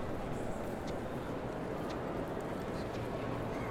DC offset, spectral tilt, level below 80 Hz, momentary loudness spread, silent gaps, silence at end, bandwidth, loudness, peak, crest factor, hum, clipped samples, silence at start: under 0.1%; -6.5 dB/octave; -50 dBFS; 2 LU; none; 0 s; 18 kHz; -40 LUFS; -24 dBFS; 14 dB; none; under 0.1%; 0 s